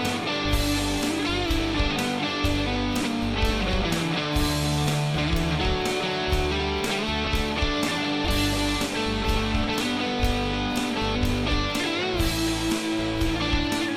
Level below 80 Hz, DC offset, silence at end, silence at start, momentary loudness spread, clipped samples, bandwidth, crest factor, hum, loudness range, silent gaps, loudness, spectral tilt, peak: -32 dBFS; under 0.1%; 0 s; 0 s; 2 LU; under 0.1%; 16 kHz; 14 dB; none; 0 LU; none; -25 LUFS; -4.5 dB/octave; -12 dBFS